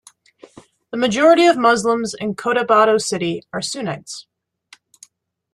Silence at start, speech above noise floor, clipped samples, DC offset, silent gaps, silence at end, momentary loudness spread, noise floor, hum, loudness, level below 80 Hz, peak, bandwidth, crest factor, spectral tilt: 0.95 s; 36 dB; under 0.1%; under 0.1%; none; 1.3 s; 16 LU; -53 dBFS; none; -17 LUFS; -60 dBFS; -2 dBFS; 12.5 kHz; 18 dB; -4 dB/octave